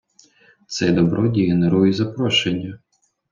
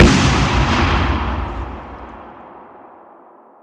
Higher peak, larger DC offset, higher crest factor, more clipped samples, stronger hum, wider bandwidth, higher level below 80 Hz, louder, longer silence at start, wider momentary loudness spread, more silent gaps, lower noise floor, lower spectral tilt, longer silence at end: second, -4 dBFS vs 0 dBFS; neither; about the same, 16 dB vs 18 dB; neither; neither; second, 7.6 kHz vs 10.5 kHz; second, -54 dBFS vs -24 dBFS; about the same, -18 LUFS vs -16 LUFS; first, 0.7 s vs 0 s; second, 10 LU vs 23 LU; neither; first, -54 dBFS vs -45 dBFS; about the same, -6 dB/octave vs -5 dB/octave; second, 0.55 s vs 1 s